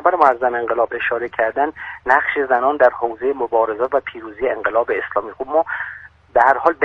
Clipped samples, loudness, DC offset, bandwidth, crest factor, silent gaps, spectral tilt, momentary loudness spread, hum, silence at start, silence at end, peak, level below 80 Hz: under 0.1%; -18 LUFS; under 0.1%; 7 kHz; 18 dB; none; -6 dB/octave; 9 LU; none; 0 s; 0 s; 0 dBFS; -54 dBFS